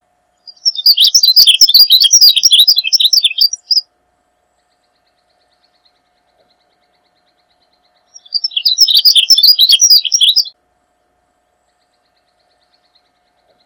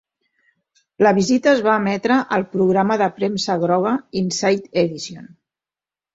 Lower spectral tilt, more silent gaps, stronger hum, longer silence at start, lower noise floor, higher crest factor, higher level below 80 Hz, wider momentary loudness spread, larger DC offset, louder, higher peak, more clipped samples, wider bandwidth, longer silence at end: second, 6 dB/octave vs -5 dB/octave; neither; neither; second, 0.45 s vs 1 s; second, -61 dBFS vs under -90 dBFS; about the same, 12 dB vs 16 dB; second, -66 dBFS vs -60 dBFS; first, 10 LU vs 7 LU; neither; first, -6 LUFS vs -18 LUFS; about the same, 0 dBFS vs -2 dBFS; first, 0.3% vs under 0.1%; first, over 20 kHz vs 8 kHz; first, 3.15 s vs 0.9 s